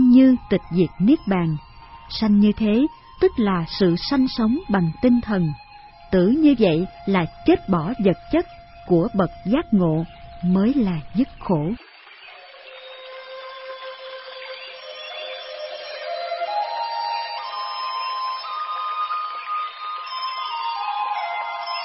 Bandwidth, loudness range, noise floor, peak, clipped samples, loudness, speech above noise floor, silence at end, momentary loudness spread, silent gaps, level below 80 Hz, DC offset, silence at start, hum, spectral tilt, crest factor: 5.8 kHz; 12 LU; -44 dBFS; -4 dBFS; under 0.1%; -22 LUFS; 25 dB; 0 s; 17 LU; none; -46 dBFS; under 0.1%; 0 s; none; -10.5 dB/octave; 18 dB